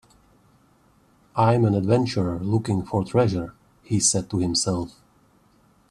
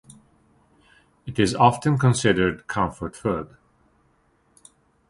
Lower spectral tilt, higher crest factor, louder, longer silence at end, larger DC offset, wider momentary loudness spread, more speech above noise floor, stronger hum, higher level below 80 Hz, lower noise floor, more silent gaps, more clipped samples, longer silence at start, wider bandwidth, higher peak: about the same, -5 dB/octave vs -5.5 dB/octave; second, 18 dB vs 24 dB; about the same, -23 LUFS vs -22 LUFS; second, 1.05 s vs 1.65 s; neither; second, 10 LU vs 13 LU; second, 37 dB vs 42 dB; neither; about the same, -52 dBFS vs -48 dBFS; second, -59 dBFS vs -63 dBFS; neither; neither; about the same, 1.35 s vs 1.25 s; about the same, 12.5 kHz vs 11.5 kHz; second, -6 dBFS vs -2 dBFS